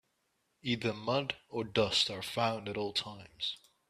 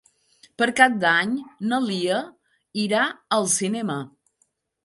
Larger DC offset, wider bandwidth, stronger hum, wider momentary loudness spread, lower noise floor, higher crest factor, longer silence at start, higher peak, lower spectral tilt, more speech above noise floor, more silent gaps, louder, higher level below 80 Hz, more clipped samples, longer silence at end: neither; first, 14.5 kHz vs 11.5 kHz; neither; second, 9 LU vs 13 LU; first, -79 dBFS vs -69 dBFS; about the same, 20 dB vs 24 dB; about the same, 0.65 s vs 0.6 s; second, -14 dBFS vs 0 dBFS; about the same, -4 dB/octave vs -3 dB/octave; about the same, 44 dB vs 47 dB; neither; second, -34 LUFS vs -22 LUFS; first, -66 dBFS vs -72 dBFS; neither; second, 0.35 s vs 0.75 s